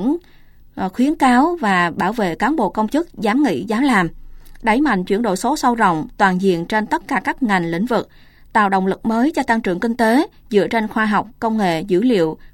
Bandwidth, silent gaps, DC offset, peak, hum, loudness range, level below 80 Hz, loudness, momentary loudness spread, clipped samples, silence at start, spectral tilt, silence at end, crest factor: 17 kHz; none; under 0.1%; -2 dBFS; none; 1 LU; -44 dBFS; -18 LUFS; 5 LU; under 0.1%; 0 s; -6 dB/octave; 0.05 s; 16 dB